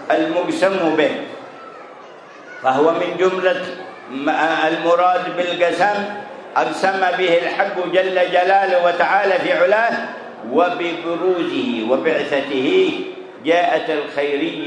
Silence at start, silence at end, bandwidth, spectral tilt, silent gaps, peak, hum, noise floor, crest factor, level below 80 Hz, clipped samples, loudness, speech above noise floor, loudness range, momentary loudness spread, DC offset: 0 s; 0 s; 10.5 kHz; -4.5 dB/octave; none; -2 dBFS; none; -39 dBFS; 16 dB; -72 dBFS; under 0.1%; -18 LUFS; 22 dB; 3 LU; 14 LU; under 0.1%